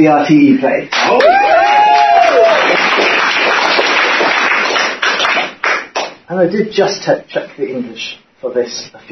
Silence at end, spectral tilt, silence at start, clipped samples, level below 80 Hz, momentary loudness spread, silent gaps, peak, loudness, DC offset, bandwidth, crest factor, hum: 0.15 s; -4 dB/octave; 0 s; under 0.1%; -56 dBFS; 13 LU; none; 0 dBFS; -11 LUFS; under 0.1%; 6.6 kHz; 12 dB; none